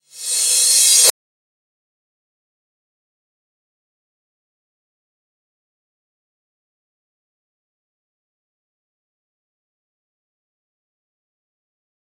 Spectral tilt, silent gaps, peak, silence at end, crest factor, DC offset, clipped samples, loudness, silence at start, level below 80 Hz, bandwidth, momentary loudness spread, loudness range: 5 dB/octave; none; 0 dBFS; 10.9 s; 26 dB; under 0.1%; under 0.1%; -11 LUFS; 0.15 s; under -90 dBFS; 16.5 kHz; 8 LU; 4 LU